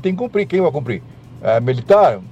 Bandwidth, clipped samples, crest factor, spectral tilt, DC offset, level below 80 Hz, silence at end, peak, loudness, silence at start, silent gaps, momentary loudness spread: 8.4 kHz; under 0.1%; 14 dB; -8 dB/octave; under 0.1%; -52 dBFS; 0 s; -2 dBFS; -16 LUFS; 0 s; none; 12 LU